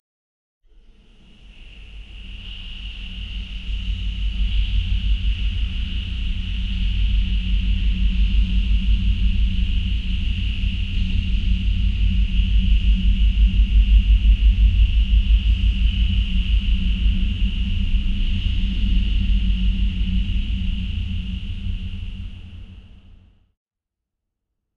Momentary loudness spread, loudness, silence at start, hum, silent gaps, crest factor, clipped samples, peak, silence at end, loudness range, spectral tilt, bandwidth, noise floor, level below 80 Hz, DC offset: 15 LU; -23 LUFS; 1.45 s; none; none; 16 dB; under 0.1%; -4 dBFS; 1.95 s; 13 LU; -6.5 dB/octave; 4.8 kHz; -84 dBFS; -20 dBFS; under 0.1%